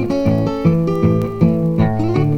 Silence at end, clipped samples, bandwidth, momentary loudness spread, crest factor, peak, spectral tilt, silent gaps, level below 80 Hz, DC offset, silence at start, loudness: 0 s; under 0.1%; 6.6 kHz; 1 LU; 14 dB; -2 dBFS; -9.5 dB/octave; none; -38 dBFS; under 0.1%; 0 s; -16 LUFS